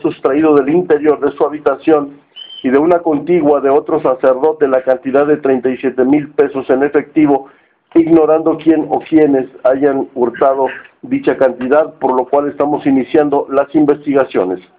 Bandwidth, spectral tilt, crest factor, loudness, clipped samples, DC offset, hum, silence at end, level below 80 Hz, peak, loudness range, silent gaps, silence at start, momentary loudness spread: 4.2 kHz; -9.5 dB/octave; 12 dB; -13 LUFS; under 0.1%; under 0.1%; none; 0.2 s; -54 dBFS; 0 dBFS; 2 LU; none; 0.05 s; 5 LU